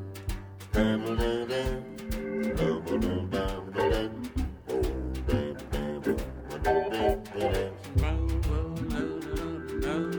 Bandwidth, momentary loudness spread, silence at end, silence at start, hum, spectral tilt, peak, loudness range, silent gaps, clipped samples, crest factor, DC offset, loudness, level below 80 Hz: over 20 kHz; 7 LU; 0 s; 0 s; none; -6.5 dB/octave; -12 dBFS; 1 LU; none; under 0.1%; 18 dB; under 0.1%; -31 LUFS; -36 dBFS